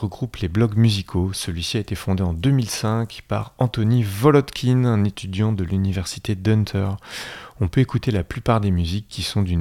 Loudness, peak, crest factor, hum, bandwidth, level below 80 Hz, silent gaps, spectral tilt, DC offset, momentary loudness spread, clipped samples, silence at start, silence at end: -21 LUFS; -2 dBFS; 18 dB; none; 15.5 kHz; -40 dBFS; none; -6.5 dB/octave; under 0.1%; 9 LU; under 0.1%; 0 s; 0 s